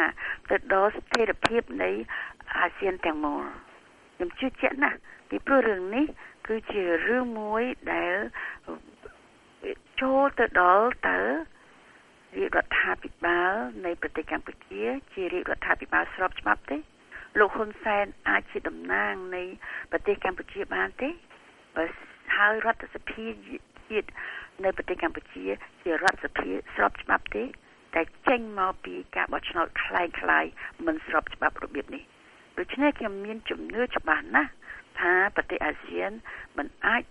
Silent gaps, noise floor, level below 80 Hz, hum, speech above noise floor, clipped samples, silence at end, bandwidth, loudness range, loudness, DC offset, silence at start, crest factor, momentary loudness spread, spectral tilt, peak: none; -56 dBFS; -52 dBFS; none; 28 dB; under 0.1%; 0.05 s; 11 kHz; 4 LU; -28 LUFS; under 0.1%; 0 s; 22 dB; 14 LU; -4.5 dB/octave; -6 dBFS